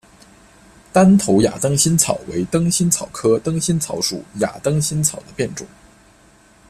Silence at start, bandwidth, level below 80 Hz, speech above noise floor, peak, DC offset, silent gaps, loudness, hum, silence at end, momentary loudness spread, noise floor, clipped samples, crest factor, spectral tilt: 0.95 s; 15.5 kHz; -48 dBFS; 33 dB; 0 dBFS; under 0.1%; none; -17 LUFS; none; 1.05 s; 11 LU; -50 dBFS; under 0.1%; 18 dB; -4.5 dB/octave